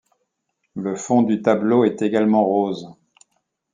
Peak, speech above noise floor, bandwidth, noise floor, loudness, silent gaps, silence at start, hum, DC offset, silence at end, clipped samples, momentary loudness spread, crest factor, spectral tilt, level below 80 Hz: -4 dBFS; 56 dB; 9.4 kHz; -74 dBFS; -19 LUFS; none; 0.75 s; none; under 0.1%; 0.8 s; under 0.1%; 12 LU; 18 dB; -6.5 dB/octave; -68 dBFS